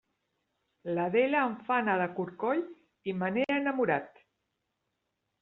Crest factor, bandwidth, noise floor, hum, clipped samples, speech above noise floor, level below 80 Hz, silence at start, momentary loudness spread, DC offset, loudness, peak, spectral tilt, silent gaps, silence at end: 18 dB; 4.8 kHz; -82 dBFS; none; under 0.1%; 53 dB; -76 dBFS; 0.85 s; 10 LU; under 0.1%; -30 LUFS; -14 dBFS; -4.5 dB/octave; none; 1.35 s